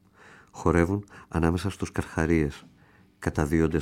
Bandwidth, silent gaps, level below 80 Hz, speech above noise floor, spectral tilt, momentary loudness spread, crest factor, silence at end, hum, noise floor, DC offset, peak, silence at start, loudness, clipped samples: 15 kHz; none; -40 dBFS; 32 dB; -7 dB/octave; 9 LU; 20 dB; 0 s; none; -58 dBFS; under 0.1%; -8 dBFS; 0.55 s; -27 LUFS; under 0.1%